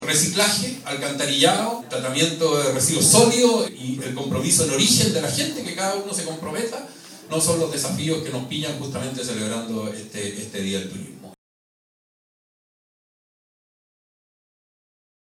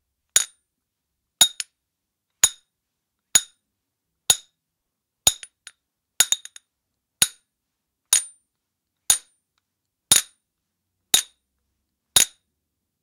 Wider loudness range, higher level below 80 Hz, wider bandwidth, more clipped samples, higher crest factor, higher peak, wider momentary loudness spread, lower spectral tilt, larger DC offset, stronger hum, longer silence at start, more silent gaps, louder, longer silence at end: first, 14 LU vs 2 LU; about the same, -60 dBFS vs -60 dBFS; first, 19 kHz vs 16.5 kHz; neither; about the same, 24 dB vs 26 dB; about the same, 0 dBFS vs 0 dBFS; about the same, 13 LU vs 12 LU; first, -3 dB/octave vs 2 dB/octave; neither; neither; second, 0 s vs 0.35 s; neither; about the same, -21 LUFS vs -20 LUFS; first, 4 s vs 0.75 s